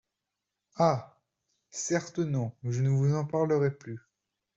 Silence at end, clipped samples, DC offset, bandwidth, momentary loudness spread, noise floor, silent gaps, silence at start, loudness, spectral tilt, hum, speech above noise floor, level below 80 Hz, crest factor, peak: 0.6 s; under 0.1%; under 0.1%; 8 kHz; 16 LU; -86 dBFS; none; 0.75 s; -29 LUFS; -6.5 dB/octave; none; 58 dB; -68 dBFS; 20 dB; -12 dBFS